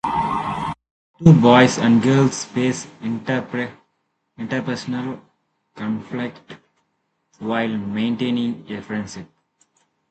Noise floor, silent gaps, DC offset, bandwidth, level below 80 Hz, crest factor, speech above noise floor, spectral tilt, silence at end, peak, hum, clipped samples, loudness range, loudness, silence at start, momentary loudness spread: -71 dBFS; 0.91-1.14 s; under 0.1%; 9 kHz; -54 dBFS; 20 dB; 53 dB; -6 dB/octave; 0.85 s; 0 dBFS; none; under 0.1%; 12 LU; -20 LUFS; 0.05 s; 18 LU